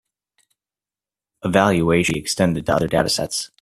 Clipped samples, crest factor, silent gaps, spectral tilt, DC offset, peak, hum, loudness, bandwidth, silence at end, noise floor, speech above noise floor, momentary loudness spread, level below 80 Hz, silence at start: under 0.1%; 20 dB; none; -4.5 dB/octave; under 0.1%; -2 dBFS; none; -19 LUFS; 15 kHz; 0.15 s; under -90 dBFS; over 71 dB; 5 LU; -46 dBFS; 1.45 s